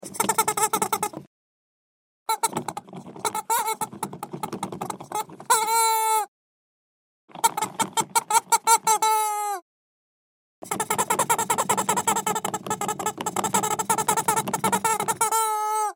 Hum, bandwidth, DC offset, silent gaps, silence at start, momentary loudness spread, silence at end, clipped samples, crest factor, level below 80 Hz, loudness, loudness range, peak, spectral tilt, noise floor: none; 16.5 kHz; under 0.1%; 1.27-2.26 s, 6.28-7.28 s, 9.62-10.62 s; 0 s; 12 LU; 0 s; under 0.1%; 22 dB; -70 dBFS; -24 LUFS; 6 LU; -4 dBFS; -2 dB/octave; under -90 dBFS